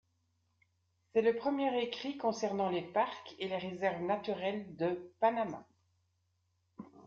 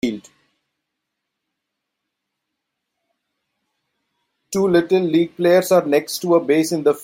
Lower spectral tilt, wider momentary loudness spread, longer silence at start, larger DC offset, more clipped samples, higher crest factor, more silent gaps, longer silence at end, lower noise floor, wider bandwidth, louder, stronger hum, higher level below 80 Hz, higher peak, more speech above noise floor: second, -3.5 dB/octave vs -5.5 dB/octave; about the same, 8 LU vs 8 LU; first, 1.15 s vs 0.05 s; neither; neither; about the same, 20 dB vs 18 dB; neither; about the same, 0 s vs 0 s; about the same, -78 dBFS vs -79 dBFS; second, 7.4 kHz vs 16.5 kHz; second, -35 LUFS vs -17 LUFS; neither; second, -80 dBFS vs -62 dBFS; second, -18 dBFS vs -2 dBFS; second, 44 dB vs 63 dB